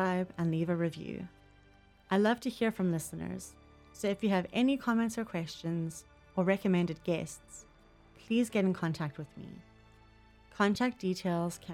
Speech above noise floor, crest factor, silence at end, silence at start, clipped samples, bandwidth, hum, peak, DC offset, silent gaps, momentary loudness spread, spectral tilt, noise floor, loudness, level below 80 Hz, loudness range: 29 dB; 18 dB; 0 s; 0 s; under 0.1%; 15.5 kHz; none; -16 dBFS; under 0.1%; none; 17 LU; -6 dB/octave; -61 dBFS; -33 LUFS; -64 dBFS; 3 LU